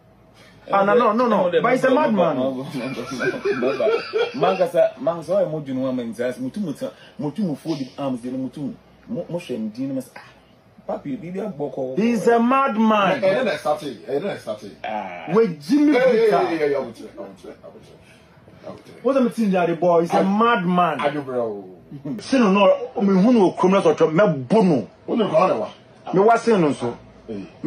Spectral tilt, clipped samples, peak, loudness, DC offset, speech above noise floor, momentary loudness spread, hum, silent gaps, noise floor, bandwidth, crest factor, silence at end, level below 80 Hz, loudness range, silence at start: -7 dB/octave; under 0.1%; -4 dBFS; -20 LUFS; under 0.1%; 31 dB; 16 LU; none; none; -51 dBFS; 13 kHz; 16 dB; 0 s; -62 dBFS; 10 LU; 0.65 s